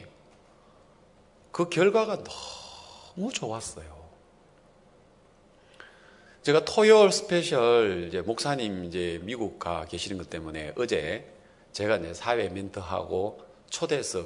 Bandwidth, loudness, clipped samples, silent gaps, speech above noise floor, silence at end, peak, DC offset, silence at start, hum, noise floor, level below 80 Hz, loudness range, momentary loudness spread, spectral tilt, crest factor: 11 kHz; -27 LUFS; under 0.1%; none; 32 dB; 0 s; -6 dBFS; under 0.1%; 0 s; none; -58 dBFS; -62 dBFS; 15 LU; 17 LU; -4 dB/octave; 22 dB